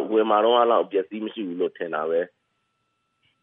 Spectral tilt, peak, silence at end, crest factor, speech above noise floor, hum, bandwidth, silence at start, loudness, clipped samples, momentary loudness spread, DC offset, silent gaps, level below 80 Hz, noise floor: -8.5 dB/octave; -6 dBFS; 1.15 s; 18 dB; 51 dB; none; 3.8 kHz; 0 s; -23 LUFS; under 0.1%; 13 LU; under 0.1%; none; -88 dBFS; -74 dBFS